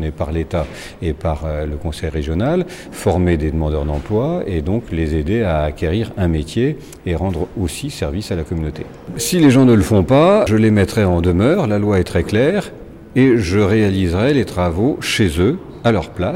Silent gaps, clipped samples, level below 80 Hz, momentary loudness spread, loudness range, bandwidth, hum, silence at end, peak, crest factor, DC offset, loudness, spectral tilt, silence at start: none; under 0.1%; -30 dBFS; 11 LU; 7 LU; 16.5 kHz; none; 0 s; -2 dBFS; 14 dB; under 0.1%; -17 LUFS; -6.5 dB/octave; 0 s